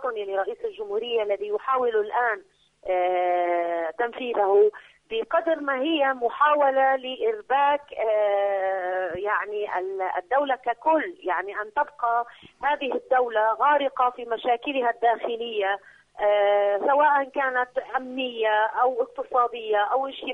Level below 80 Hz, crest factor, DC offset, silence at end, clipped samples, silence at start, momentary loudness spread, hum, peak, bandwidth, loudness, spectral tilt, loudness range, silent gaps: -68 dBFS; 16 dB; under 0.1%; 0 s; under 0.1%; 0 s; 8 LU; none; -8 dBFS; 6 kHz; -24 LUFS; -4.5 dB/octave; 3 LU; none